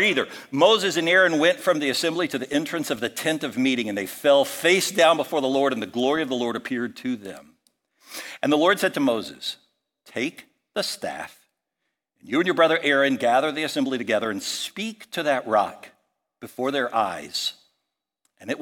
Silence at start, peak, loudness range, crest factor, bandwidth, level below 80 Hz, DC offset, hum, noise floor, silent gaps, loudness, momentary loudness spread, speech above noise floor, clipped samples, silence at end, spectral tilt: 0 s; -4 dBFS; 6 LU; 20 dB; 17.5 kHz; -72 dBFS; under 0.1%; none; -81 dBFS; none; -23 LUFS; 14 LU; 58 dB; under 0.1%; 0 s; -3.5 dB/octave